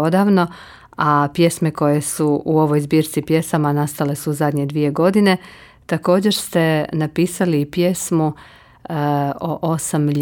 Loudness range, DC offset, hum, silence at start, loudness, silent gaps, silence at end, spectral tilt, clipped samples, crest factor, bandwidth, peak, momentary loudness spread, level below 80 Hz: 2 LU; under 0.1%; none; 0 s; -18 LUFS; none; 0 s; -6 dB/octave; under 0.1%; 14 dB; 18.5 kHz; -4 dBFS; 7 LU; -54 dBFS